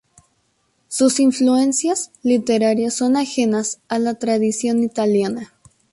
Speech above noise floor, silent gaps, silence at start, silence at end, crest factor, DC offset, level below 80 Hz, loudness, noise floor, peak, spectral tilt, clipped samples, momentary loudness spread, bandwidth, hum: 47 dB; none; 0.9 s; 0.5 s; 14 dB; under 0.1%; -62 dBFS; -18 LUFS; -65 dBFS; -4 dBFS; -4 dB/octave; under 0.1%; 7 LU; 11.5 kHz; none